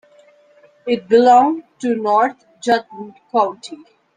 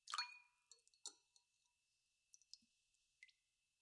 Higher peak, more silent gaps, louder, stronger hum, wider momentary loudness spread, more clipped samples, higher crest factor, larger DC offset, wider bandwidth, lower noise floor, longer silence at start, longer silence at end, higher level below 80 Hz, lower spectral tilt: first, -2 dBFS vs -26 dBFS; neither; first, -16 LUFS vs -53 LUFS; neither; about the same, 23 LU vs 21 LU; neither; second, 16 dB vs 34 dB; neither; second, 9.6 kHz vs 11 kHz; second, -51 dBFS vs -88 dBFS; first, 0.85 s vs 0.05 s; second, 0.4 s vs 0.55 s; first, -64 dBFS vs under -90 dBFS; first, -4.5 dB/octave vs 4 dB/octave